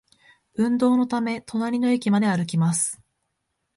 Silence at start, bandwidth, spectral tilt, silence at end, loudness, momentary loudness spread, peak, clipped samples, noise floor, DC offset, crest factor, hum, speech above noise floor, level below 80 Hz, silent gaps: 0.6 s; 11.5 kHz; -5.5 dB/octave; 0.8 s; -23 LUFS; 7 LU; -8 dBFS; under 0.1%; -77 dBFS; under 0.1%; 14 dB; none; 55 dB; -66 dBFS; none